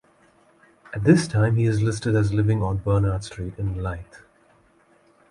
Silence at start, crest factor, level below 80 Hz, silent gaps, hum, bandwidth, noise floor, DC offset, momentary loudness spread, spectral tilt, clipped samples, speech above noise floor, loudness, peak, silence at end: 0.9 s; 20 dB; -42 dBFS; none; none; 11 kHz; -59 dBFS; under 0.1%; 13 LU; -7 dB/octave; under 0.1%; 37 dB; -22 LUFS; -4 dBFS; 1.15 s